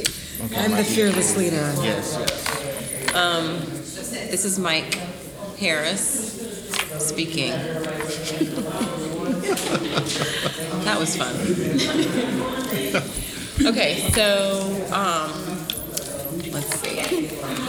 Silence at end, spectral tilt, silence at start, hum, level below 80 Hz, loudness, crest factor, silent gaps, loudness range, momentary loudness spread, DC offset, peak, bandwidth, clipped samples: 0 s; -3.5 dB/octave; 0 s; none; -46 dBFS; -23 LUFS; 18 dB; none; 3 LU; 9 LU; under 0.1%; -6 dBFS; over 20 kHz; under 0.1%